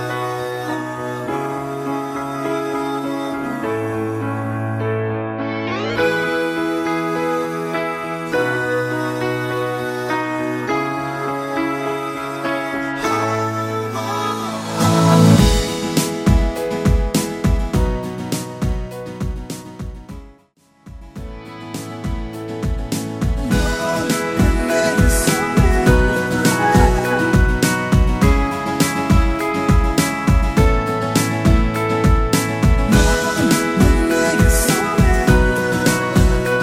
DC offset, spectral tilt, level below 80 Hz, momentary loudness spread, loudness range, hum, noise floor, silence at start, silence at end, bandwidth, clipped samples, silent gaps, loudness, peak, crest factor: under 0.1%; -5.5 dB/octave; -24 dBFS; 10 LU; 8 LU; none; -55 dBFS; 0 s; 0 s; 16 kHz; under 0.1%; none; -18 LUFS; 0 dBFS; 16 dB